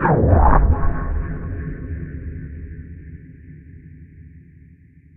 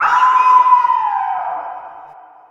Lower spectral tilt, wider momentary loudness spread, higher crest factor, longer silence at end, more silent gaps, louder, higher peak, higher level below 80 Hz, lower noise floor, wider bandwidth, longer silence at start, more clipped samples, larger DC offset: first, -11 dB/octave vs -1 dB/octave; first, 27 LU vs 17 LU; first, 20 dB vs 14 dB; first, 0.75 s vs 0.4 s; neither; second, -20 LUFS vs -13 LUFS; about the same, 0 dBFS vs 0 dBFS; first, -24 dBFS vs -70 dBFS; first, -48 dBFS vs -40 dBFS; second, 2.8 kHz vs 7.6 kHz; about the same, 0 s vs 0 s; neither; neither